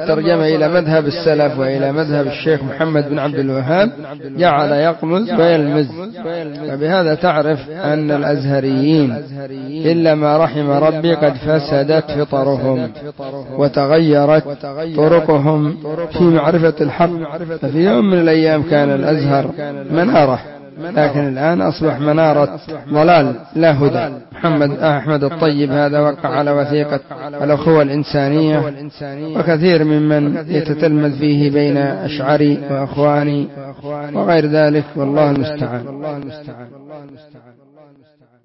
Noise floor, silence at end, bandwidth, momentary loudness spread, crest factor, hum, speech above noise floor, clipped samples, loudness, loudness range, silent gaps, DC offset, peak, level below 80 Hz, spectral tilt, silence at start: -51 dBFS; 1.05 s; 5.8 kHz; 12 LU; 12 dB; none; 37 dB; under 0.1%; -15 LUFS; 2 LU; none; under 0.1%; -2 dBFS; -50 dBFS; -11.5 dB/octave; 0 s